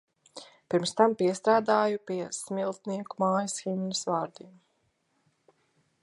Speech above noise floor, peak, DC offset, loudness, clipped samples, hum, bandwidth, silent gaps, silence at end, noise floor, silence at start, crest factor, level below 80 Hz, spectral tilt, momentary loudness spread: 46 dB; -8 dBFS; under 0.1%; -28 LUFS; under 0.1%; none; 11.5 kHz; none; 1.55 s; -74 dBFS; 0.35 s; 22 dB; -78 dBFS; -4.5 dB/octave; 15 LU